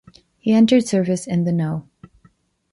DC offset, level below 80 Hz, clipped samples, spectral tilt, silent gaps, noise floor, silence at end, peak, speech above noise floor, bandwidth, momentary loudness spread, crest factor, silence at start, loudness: under 0.1%; -58 dBFS; under 0.1%; -6.5 dB/octave; none; -57 dBFS; 0.9 s; -4 dBFS; 40 dB; 11.5 kHz; 12 LU; 16 dB; 0.45 s; -18 LUFS